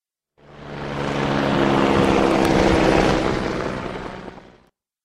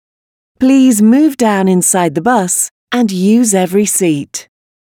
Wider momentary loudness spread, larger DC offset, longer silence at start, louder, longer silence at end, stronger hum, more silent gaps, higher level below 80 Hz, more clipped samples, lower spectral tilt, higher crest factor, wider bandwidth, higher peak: first, 16 LU vs 7 LU; neither; about the same, 0.5 s vs 0.6 s; second, -19 LUFS vs -11 LUFS; about the same, 0.65 s vs 0.55 s; neither; second, none vs 2.71-2.87 s; first, -36 dBFS vs -58 dBFS; neither; first, -6 dB/octave vs -4.5 dB/octave; first, 18 dB vs 12 dB; second, 15.5 kHz vs 18.5 kHz; about the same, -2 dBFS vs 0 dBFS